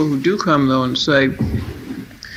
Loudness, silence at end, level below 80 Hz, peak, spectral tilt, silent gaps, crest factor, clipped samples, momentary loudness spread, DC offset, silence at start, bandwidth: -17 LUFS; 0 s; -38 dBFS; -2 dBFS; -6 dB/octave; none; 16 dB; under 0.1%; 16 LU; under 0.1%; 0 s; 15 kHz